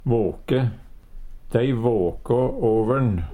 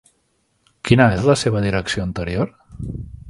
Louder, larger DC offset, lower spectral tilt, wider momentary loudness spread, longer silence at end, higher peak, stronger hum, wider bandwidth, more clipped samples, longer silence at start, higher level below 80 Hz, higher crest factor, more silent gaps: second, -22 LUFS vs -18 LUFS; neither; first, -9.5 dB/octave vs -6 dB/octave; second, 4 LU vs 17 LU; about the same, 0 s vs 0 s; second, -6 dBFS vs 0 dBFS; neither; about the same, 11 kHz vs 11.5 kHz; neither; second, 0 s vs 0.85 s; about the same, -38 dBFS vs -38 dBFS; about the same, 16 dB vs 20 dB; neither